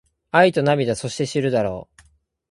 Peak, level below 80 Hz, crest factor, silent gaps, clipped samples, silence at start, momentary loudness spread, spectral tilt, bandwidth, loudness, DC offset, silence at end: 0 dBFS; -54 dBFS; 20 dB; none; under 0.1%; 0.35 s; 9 LU; -5.5 dB/octave; 11.5 kHz; -20 LUFS; under 0.1%; 0.65 s